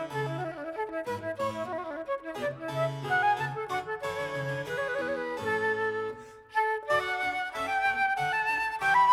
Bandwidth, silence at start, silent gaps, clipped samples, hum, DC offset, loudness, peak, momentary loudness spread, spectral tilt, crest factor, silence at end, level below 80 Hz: 16 kHz; 0 s; none; under 0.1%; none; under 0.1%; -30 LUFS; -14 dBFS; 9 LU; -5 dB/octave; 16 dB; 0 s; -64 dBFS